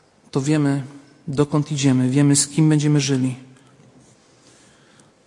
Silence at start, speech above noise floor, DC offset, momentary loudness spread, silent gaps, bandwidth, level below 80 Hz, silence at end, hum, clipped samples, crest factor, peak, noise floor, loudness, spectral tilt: 0.35 s; 35 dB; under 0.1%; 12 LU; none; 11.5 kHz; -62 dBFS; 1.8 s; none; under 0.1%; 18 dB; -4 dBFS; -53 dBFS; -19 LUFS; -5.5 dB/octave